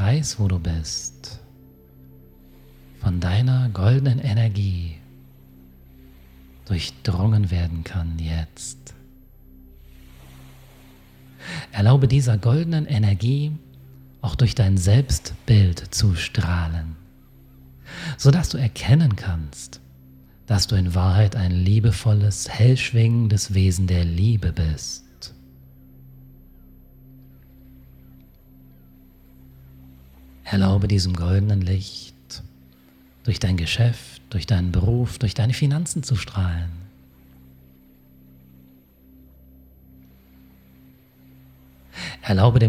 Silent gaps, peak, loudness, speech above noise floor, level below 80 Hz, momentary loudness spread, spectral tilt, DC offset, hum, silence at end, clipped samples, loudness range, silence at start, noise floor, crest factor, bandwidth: none; 0 dBFS; -21 LUFS; 32 dB; -38 dBFS; 17 LU; -6 dB/octave; under 0.1%; none; 0 s; under 0.1%; 10 LU; 0 s; -52 dBFS; 22 dB; 14.5 kHz